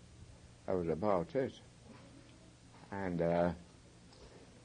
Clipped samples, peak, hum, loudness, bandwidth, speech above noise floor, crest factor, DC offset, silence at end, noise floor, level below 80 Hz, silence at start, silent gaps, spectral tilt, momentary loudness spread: under 0.1%; -18 dBFS; none; -37 LUFS; 10 kHz; 24 dB; 22 dB; under 0.1%; 0.05 s; -59 dBFS; -64 dBFS; 0.1 s; none; -7.5 dB/octave; 25 LU